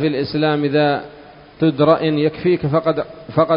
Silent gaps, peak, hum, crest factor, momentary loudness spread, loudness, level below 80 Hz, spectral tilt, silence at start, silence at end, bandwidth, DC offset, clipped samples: none; 0 dBFS; none; 18 dB; 8 LU; -18 LUFS; -50 dBFS; -10.5 dB/octave; 0 s; 0 s; 5.4 kHz; under 0.1%; under 0.1%